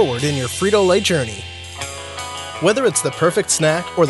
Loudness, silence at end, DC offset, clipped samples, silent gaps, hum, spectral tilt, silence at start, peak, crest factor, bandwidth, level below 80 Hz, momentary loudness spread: -18 LUFS; 0 s; under 0.1%; under 0.1%; none; none; -3.5 dB/octave; 0 s; -2 dBFS; 16 dB; 12 kHz; -48 dBFS; 13 LU